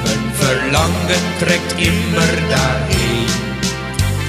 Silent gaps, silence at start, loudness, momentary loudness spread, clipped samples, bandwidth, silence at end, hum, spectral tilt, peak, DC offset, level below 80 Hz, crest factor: none; 0 s; -16 LUFS; 4 LU; under 0.1%; 15 kHz; 0 s; none; -4.5 dB/octave; 0 dBFS; under 0.1%; -28 dBFS; 16 dB